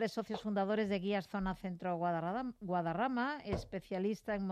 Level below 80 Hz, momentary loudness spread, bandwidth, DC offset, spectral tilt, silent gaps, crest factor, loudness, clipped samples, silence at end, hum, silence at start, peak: -58 dBFS; 6 LU; 13.5 kHz; under 0.1%; -7 dB/octave; none; 14 dB; -38 LUFS; under 0.1%; 0 s; none; 0 s; -22 dBFS